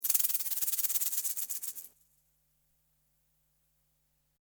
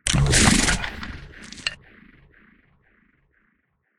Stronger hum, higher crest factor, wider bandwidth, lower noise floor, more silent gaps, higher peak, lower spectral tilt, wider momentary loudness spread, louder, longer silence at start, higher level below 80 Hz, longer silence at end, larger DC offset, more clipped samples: neither; about the same, 26 dB vs 24 dB; first, over 20 kHz vs 13.5 kHz; first, -75 dBFS vs -69 dBFS; neither; second, -10 dBFS vs 0 dBFS; second, 4 dB/octave vs -3 dB/octave; second, 11 LU vs 22 LU; second, -30 LUFS vs -20 LUFS; about the same, 0 s vs 0.05 s; second, -82 dBFS vs -32 dBFS; first, 2.5 s vs 2.25 s; neither; neither